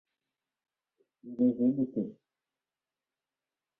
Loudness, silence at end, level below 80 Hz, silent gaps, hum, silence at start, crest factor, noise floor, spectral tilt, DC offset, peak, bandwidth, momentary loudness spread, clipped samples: -30 LUFS; 1.65 s; -76 dBFS; none; none; 1.25 s; 18 dB; under -90 dBFS; -12.5 dB/octave; under 0.1%; -16 dBFS; 1 kHz; 14 LU; under 0.1%